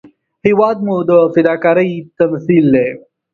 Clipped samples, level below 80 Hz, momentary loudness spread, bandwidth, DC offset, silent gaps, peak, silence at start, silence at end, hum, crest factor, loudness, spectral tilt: under 0.1%; -54 dBFS; 8 LU; 4.6 kHz; under 0.1%; none; 0 dBFS; 0.45 s; 0.35 s; none; 12 dB; -13 LUFS; -9.5 dB/octave